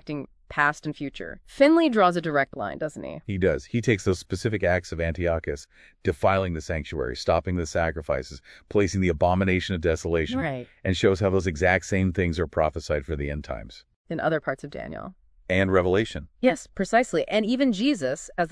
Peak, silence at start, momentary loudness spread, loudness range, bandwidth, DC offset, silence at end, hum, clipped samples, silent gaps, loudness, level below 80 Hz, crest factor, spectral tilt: -6 dBFS; 0.05 s; 13 LU; 4 LU; 11 kHz; under 0.1%; 0 s; none; under 0.1%; 13.96-14.05 s; -25 LUFS; -42 dBFS; 20 dB; -6 dB/octave